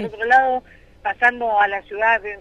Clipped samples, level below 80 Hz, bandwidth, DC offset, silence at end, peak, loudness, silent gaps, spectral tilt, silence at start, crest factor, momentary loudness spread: under 0.1%; -52 dBFS; 8.2 kHz; under 0.1%; 0 s; -4 dBFS; -18 LUFS; none; -4.5 dB/octave; 0 s; 16 dB; 11 LU